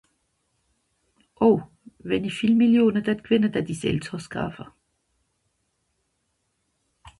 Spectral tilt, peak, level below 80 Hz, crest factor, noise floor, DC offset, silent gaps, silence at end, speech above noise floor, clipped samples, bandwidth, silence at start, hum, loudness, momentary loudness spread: -6.5 dB/octave; -6 dBFS; -56 dBFS; 18 dB; -74 dBFS; under 0.1%; none; 0.1 s; 52 dB; under 0.1%; 11.5 kHz; 1.4 s; none; -23 LUFS; 14 LU